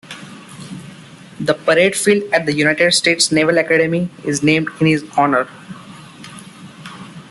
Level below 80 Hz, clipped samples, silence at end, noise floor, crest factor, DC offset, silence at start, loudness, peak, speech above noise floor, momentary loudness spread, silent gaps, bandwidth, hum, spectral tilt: -56 dBFS; under 0.1%; 0.1 s; -39 dBFS; 16 dB; under 0.1%; 0.05 s; -15 LUFS; 0 dBFS; 23 dB; 23 LU; none; 12.5 kHz; none; -4 dB/octave